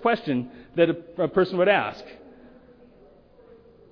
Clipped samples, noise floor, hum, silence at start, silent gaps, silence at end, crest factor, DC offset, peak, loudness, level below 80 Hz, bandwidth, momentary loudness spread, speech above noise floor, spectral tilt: under 0.1%; -53 dBFS; none; 0 s; none; 1.75 s; 20 dB; under 0.1%; -6 dBFS; -24 LUFS; -60 dBFS; 5.4 kHz; 12 LU; 30 dB; -8 dB/octave